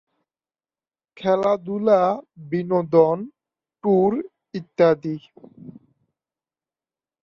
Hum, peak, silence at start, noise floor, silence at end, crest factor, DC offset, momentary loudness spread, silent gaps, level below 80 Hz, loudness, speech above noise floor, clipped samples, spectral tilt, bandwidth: none; -4 dBFS; 1.2 s; under -90 dBFS; 1.5 s; 20 dB; under 0.1%; 15 LU; none; -66 dBFS; -21 LUFS; over 70 dB; under 0.1%; -8.5 dB/octave; 6.8 kHz